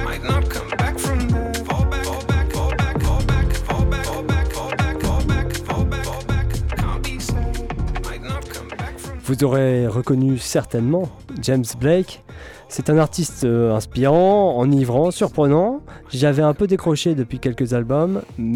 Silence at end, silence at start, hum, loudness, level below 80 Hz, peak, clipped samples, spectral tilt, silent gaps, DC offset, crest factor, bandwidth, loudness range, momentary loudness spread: 0 s; 0 s; none; -20 LUFS; -26 dBFS; -6 dBFS; under 0.1%; -6.5 dB/octave; none; under 0.1%; 12 dB; 17.5 kHz; 6 LU; 11 LU